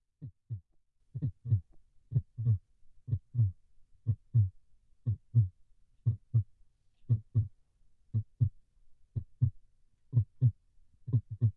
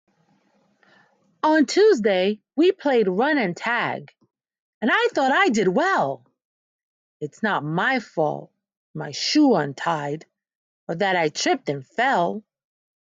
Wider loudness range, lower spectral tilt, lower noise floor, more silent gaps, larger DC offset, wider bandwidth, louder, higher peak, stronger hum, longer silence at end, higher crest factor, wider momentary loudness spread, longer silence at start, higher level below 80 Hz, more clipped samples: about the same, 2 LU vs 4 LU; first, -13 dB/octave vs -4.5 dB/octave; first, -69 dBFS vs -64 dBFS; second, none vs 4.60-4.81 s, 6.45-7.20 s, 8.77-8.94 s, 10.55-10.87 s; neither; second, 1.2 kHz vs 9.2 kHz; second, -34 LUFS vs -21 LUFS; second, -16 dBFS vs -8 dBFS; neither; second, 0.05 s vs 0.8 s; about the same, 18 dB vs 16 dB; about the same, 14 LU vs 16 LU; second, 0.2 s vs 1.45 s; first, -60 dBFS vs -74 dBFS; neither